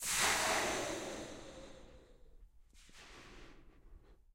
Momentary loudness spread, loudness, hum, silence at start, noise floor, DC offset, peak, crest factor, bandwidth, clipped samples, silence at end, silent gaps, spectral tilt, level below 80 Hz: 26 LU; -35 LUFS; none; 0 s; -61 dBFS; under 0.1%; -20 dBFS; 22 dB; 16 kHz; under 0.1%; 0.2 s; none; -1 dB/octave; -60 dBFS